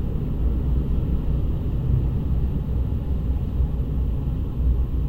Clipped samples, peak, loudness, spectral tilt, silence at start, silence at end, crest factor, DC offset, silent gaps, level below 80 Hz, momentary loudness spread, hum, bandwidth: under 0.1%; -10 dBFS; -25 LUFS; -10.5 dB/octave; 0 s; 0 s; 12 dB; 0.2%; none; -24 dBFS; 2 LU; none; 3.8 kHz